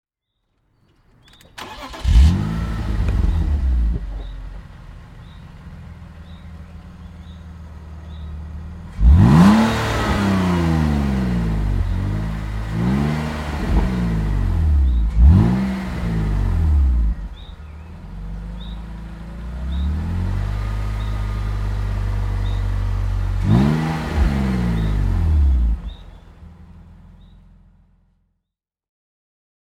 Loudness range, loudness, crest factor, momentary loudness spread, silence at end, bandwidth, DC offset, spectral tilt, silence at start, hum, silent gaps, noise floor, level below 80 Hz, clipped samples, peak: 13 LU; -19 LUFS; 18 dB; 23 LU; 2.85 s; 11.5 kHz; under 0.1%; -7.5 dB/octave; 1.55 s; none; none; -82 dBFS; -22 dBFS; under 0.1%; 0 dBFS